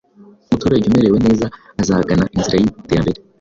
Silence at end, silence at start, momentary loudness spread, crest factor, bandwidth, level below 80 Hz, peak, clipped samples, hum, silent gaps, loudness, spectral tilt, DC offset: 0.25 s; 0.5 s; 8 LU; 14 dB; 7.6 kHz; -36 dBFS; -2 dBFS; under 0.1%; none; none; -16 LUFS; -6.5 dB/octave; under 0.1%